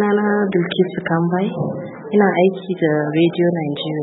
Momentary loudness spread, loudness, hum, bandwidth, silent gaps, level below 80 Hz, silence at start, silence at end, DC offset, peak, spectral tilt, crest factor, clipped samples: 7 LU; -18 LUFS; none; 4.1 kHz; none; -64 dBFS; 0 s; 0 s; under 0.1%; -2 dBFS; -12 dB/octave; 16 dB; under 0.1%